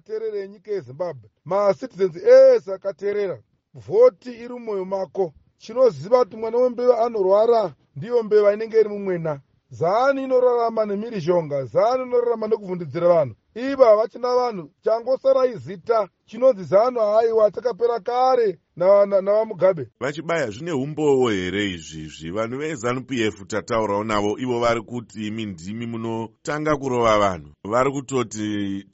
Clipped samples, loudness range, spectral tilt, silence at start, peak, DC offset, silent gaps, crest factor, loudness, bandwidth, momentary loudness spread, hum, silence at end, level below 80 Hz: under 0.1%; 5 LU; -5 dB/octave; 0.1 s; -2 dBFS; under 0.1%; none; 20 dB; -21 LUFS; 8 kHz; 13 LU; none; 0.1 s; -56 dBFS